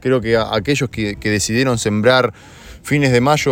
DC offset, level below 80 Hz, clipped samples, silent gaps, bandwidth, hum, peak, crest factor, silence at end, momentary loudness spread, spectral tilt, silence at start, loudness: under 0.1%; -42 dBFS; under 0.1%; none; 17 kHz; none; 0 dBFS; 16 dB; 0 s; 8 LU; -5 dB/octave; 0 s; -16 LUFS